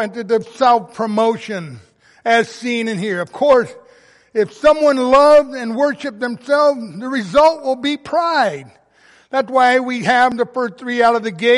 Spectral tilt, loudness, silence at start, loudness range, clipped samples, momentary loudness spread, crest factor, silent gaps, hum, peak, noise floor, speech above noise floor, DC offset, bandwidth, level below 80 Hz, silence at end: -4.5 dB/octave; -16 LUFS; 0 s; 4 LU; under 0.1%; 11 LU; 14 dB; none; none; -2 dBFS; -51 dBFS; 35 dB; under 0.1%; 11.5 kHz; -52 dBFS; 0 s